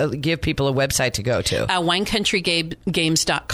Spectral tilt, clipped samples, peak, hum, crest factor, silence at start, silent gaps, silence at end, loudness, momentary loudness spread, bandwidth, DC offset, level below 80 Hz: -3.5 dB/octave; under 0.1%; -4 dBFS; none; 16 dB; 0 s; none; 0 s; -20 LUFS; 3 LU; 15.5 kHz; under 0.1%; -40 dBFS